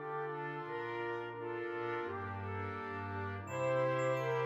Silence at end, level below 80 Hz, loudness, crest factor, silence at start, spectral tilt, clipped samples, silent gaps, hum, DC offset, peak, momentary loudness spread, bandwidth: 0 s; -78 dBFS; -39 LUFS; 16 dB; 0 s; -6.5 dB/octave; under 0.1%; none; none; under 0.1%; -24 dBFS; 8 LU; 14 kHz